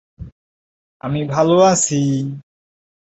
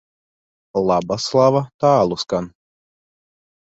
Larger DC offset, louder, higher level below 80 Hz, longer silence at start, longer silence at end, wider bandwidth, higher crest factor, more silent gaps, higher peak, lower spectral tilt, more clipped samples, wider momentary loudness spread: neither; about the same, -16 LUFS vs -18 LUFS; first, -48 dBFS vs -54 dBFS; second, 0.2 s vs 0.75 s; second, 0.65 s vs 1.2 s; about the same, 8.2 kHz vs 8.2 kHz; about the same, 18 dB vs 18 dB; first, 0.32-1.00 s vs 1.74-1.79 s; about the same, -2 dBFS vs -2 dBFS; about the same, -5 dB/octave vs -6 dB/octave; neither; first, 17 LU vs 10 LU